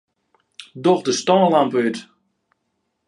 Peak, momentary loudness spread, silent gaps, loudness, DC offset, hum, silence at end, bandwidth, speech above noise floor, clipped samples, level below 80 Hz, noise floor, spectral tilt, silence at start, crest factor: -2 dBFS; 14 LU; none; -18 LUFS; under 0.1%; none; 1.05 s; 11 kHz; 56 dB; under 0.1%; -68 dBFS; -73 dBFS; -5 dB/octave; 0.6 s; 18 dB